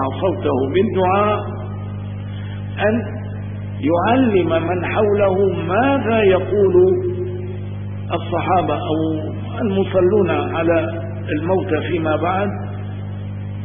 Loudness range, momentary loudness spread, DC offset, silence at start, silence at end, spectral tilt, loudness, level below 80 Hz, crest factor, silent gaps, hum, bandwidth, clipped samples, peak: 5 LU; 13 LU; 0.3%; 0 s; 0 s; -12.5 dB/octave; -19 LUFS; -44 dBFS; 16 dB; none; 50 Hz at -25 dBFS; 3.7 kHz; under 0.1%; -2 dBFS